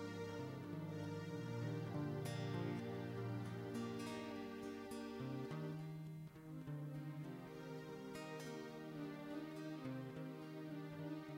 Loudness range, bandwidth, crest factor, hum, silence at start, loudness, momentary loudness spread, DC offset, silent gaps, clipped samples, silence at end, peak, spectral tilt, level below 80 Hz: 4 LU; 16 kHz; 14 dB; none; 0 s; -49 LUFS; 6 LU; under 0.1%; none; under 0.1%; 0 s; -34 dBFS; -7 dB/octave; -78 dBFS